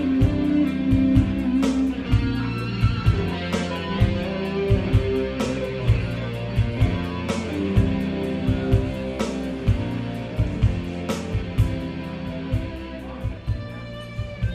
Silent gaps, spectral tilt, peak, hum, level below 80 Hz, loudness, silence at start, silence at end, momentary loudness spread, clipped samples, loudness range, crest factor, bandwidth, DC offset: none; -7.5 dB/octave; -4 dBFS; none; -30 dBFS; -24 LUFS; 0 s; 0 s; 10 LU; under 0.1%; 5 LU; 18 dB; 12 kHz; under 0.1%